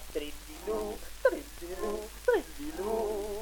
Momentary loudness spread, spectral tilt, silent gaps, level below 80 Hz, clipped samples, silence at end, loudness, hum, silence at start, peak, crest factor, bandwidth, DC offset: 11 LU; -4 dB/octave; none; -48 dBFS; under 0.1%; 0 s; -34 LUFS; none; 0 s; -14 dBFS; 20 dB; 19 kHz; under 0.1%